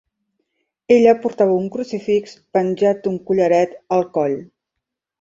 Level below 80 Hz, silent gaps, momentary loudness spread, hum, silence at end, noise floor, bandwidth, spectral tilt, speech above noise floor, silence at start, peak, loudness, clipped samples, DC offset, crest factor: -62 dBFS; none; 10 LU; none; 0.8 s; -81 dBFS; 7.6 kHz; -7 dB/octave; 64 dB; 0.9 s; -2 dBFS; -18 LUFS; under 0.1%; under 0.1%; 16 dB